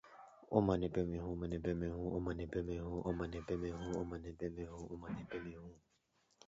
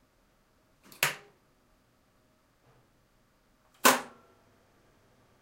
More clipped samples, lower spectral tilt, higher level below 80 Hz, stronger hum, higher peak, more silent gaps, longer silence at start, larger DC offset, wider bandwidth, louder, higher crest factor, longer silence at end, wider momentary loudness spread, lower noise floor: neither; first, -7.5 dB/octave vs -1 dB/octave; first, -54 dBFS vs -74 dBFS; neither; second, -18 dBFS vs -6 dBFS; neither; second, 0.05 s vs 1 s; neither; second, 7.6 kHz vs 16 kHz; second, -41 LUFS vs -27 LUFS; second, 24 dB vs 30 dB; second, 0.7 s vs 1.35 s; second, 13 LU vs 21 LU; first, -78 dBFS vs -68 dBFS